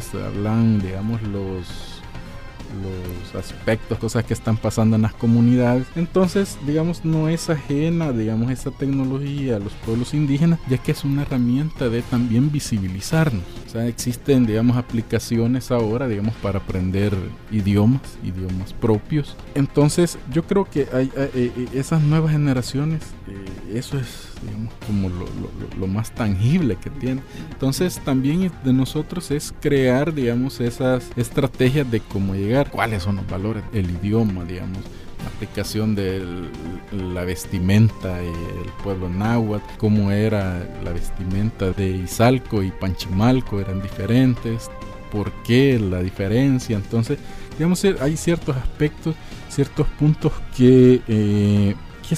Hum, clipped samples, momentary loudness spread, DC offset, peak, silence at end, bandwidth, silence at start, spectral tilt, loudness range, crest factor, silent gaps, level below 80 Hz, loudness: none; under 0.1%; 12 LU; under 0.1%; -2 dBFS; 0 s; 15.5 kHz; 0 s; -7 dB/octave; 5 LU; 18 dB; none; -36 dBFS; -21 LUFS